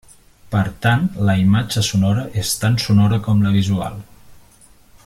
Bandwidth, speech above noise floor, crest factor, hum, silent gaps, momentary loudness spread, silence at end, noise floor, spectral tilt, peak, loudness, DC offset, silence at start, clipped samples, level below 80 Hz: 15.5 kHz; 32 dB; 16 dB; none; none; 7 LU; 0.7 s; -48 dBFS; -5.5 dB/octave; -2 dBFS; -17 LUFS; under 0.1%; 0.5 s; under 0.1%; -44 dBFS